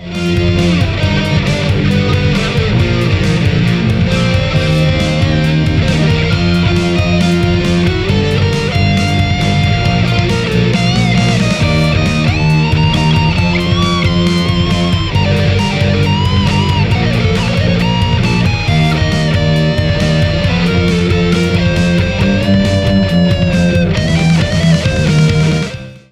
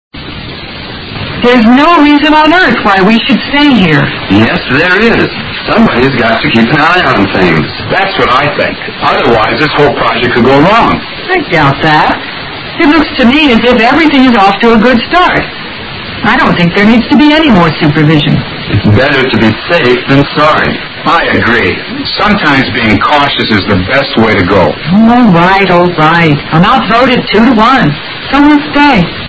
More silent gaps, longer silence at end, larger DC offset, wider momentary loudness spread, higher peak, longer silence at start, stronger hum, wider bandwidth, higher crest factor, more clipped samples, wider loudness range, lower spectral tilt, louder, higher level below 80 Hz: neither; first, 0.15 s vs 0 s; neither; second, 2 LU vs 8 LU; about the same, 0 dBFS vs 0 dBFS; second, 0 s vs 0.15 s; neither; first, 12 kHz vs 8 kHz; about the same, 10 dB vs 6 dB; second, under 0.1% vs 3%; about the same, 1 LU vs 2 LU; about the same, -6.5 dB/octave vs -7 dB/octave; second, -12 LUFS vs -6 LUFS; about the same, -26 dBFS vs -30 dBFS